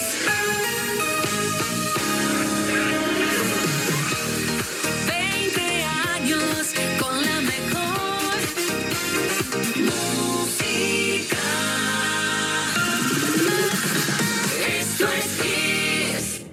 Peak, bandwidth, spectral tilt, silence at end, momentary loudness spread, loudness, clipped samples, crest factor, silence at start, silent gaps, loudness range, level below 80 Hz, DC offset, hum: -8 dBFS; 17 kHz; -2.5 dB/octave; 0 s; 3 LU; -22 LUFS; under 0.1%; 16 dB; 0 s; none; 2 LU; -54 dBFS; under 0.1%; none